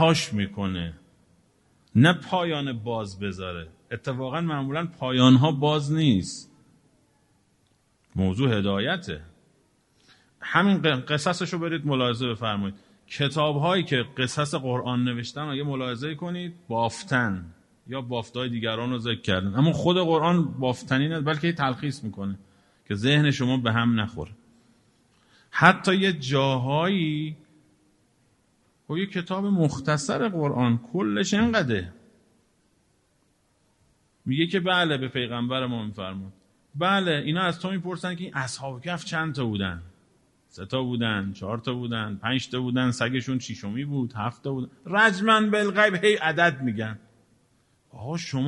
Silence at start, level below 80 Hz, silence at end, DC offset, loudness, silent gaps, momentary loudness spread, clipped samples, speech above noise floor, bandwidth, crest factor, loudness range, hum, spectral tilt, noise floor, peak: 0 s; -58 dBFS; 0 s; under 0.1%; -25 LUFS; none; 13 LU; under 0.1%; 42 dB; 11.5 kHz; 26 dB; 6 LU; none; -5.5 dB/octave; -67 dBFS; 0 dBFS